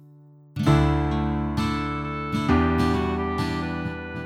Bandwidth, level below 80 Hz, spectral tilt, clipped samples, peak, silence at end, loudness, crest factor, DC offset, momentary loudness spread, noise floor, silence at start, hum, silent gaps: 13.5 kHz; -34 dBFS; -7.5 dB/octave; under 0.1%; -6 dBFS; 0 s; -24 LUFS; 18 dB; under 0.1%; 9 LU; -50 dBFS; 0.55 s; none; none